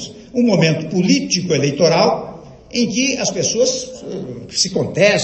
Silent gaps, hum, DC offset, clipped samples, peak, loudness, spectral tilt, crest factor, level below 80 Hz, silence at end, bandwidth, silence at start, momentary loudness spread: none; none; under 0.1%; under 0.1%; -2 dBFS; -16 LUFS; -4 dB/octave; 16 dB; -50 dBFS; 0 s; 8.8 kHz; 0 s; 12 LU